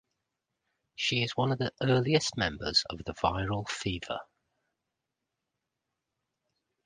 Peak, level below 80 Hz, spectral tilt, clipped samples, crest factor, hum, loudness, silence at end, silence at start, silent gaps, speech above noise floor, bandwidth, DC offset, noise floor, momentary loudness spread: -10 dBFS; -54 dBFS; -4.5 dB/octave; under 0.1%; 24 dB; none; -30 LUFS; 2.6 s; 1 s; none; 56 dB; 10 kHz; under 0.1%; -86 dBFS; 11 LU